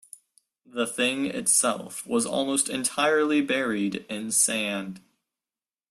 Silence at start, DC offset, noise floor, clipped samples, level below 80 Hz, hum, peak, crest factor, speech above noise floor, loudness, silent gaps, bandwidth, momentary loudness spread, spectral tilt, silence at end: 0.75 s; under 0.1%; under -90 dBFS; under 0.1%; -70 dBFS; none; -8 dBFS; 20 dB; over 64 dB; -24 LUFS; none; 15.5 kHz; 11 LU; -2 dB/octave; 0.9 s